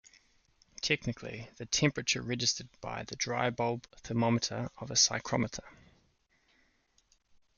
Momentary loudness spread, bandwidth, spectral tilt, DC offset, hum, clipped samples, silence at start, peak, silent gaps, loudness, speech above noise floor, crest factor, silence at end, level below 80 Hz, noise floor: 14 LU; 10.5 kHz; -3 dB/octave; under 0.1%; none; under 0.1%; 0.85 s; -14 dBFS; none; -32 LUFS; 39 dB; 22 dB; 1.85 s; -62 dBFS; -72 dBFS